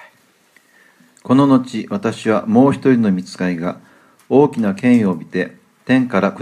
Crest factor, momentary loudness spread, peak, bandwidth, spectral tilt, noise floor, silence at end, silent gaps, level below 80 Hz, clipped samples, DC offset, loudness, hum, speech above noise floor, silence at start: 16 dB; 11 LU; 0 dBFS; 10.5 kHz; -7.5 dB/octave; -54 dBFS; 0 s; none; -62 dBFS; under 0.1%; under 0.1%; -16 LUFS; none; 39 dB; 1.25 s